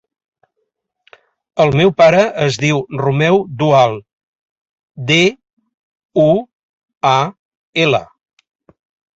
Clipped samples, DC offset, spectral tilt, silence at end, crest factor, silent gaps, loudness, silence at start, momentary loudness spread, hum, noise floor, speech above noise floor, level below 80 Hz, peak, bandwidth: under 0.1%; under 0.1%; -5.5 dB/octave; 1.15 s; 16 dB; 4.13-4.74 s, 4.83-4.88 s, 5.53-5.57 s, 5.74-6.09 s, 6.55-6.82 s, 6.97-7.01 s, 7.39-7.51 s, 7.57-7.73 s; -14 LUFS; 1.55 s; 11 LU; none; -72 dBFS; 59 dB; -52 dBFS; -2 dBFS; 8 kHz